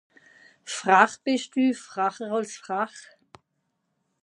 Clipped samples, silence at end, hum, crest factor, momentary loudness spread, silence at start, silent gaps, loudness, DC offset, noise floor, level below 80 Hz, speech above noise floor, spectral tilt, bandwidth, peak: under 0.1%; 1.2 s; none; 26 dB; 13 LU; 0.65 s; none; -25 LUFS; under 0.1%; -77 dBFS; -80 dBFS; 52 dB; -3.5 dB/octave; 11 kHz; -2 dBFS